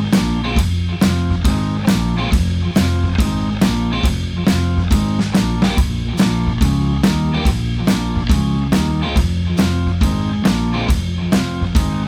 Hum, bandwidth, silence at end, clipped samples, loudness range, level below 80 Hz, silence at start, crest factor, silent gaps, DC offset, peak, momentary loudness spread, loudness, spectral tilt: none; 17 kHz; 0 s; under 0.1%; 1 LU; -22 dBFS; 0 s; 14 dB; none; under 0.1%; -2 dBFS; 2 LU; -17 LUFS; -6 dB/octave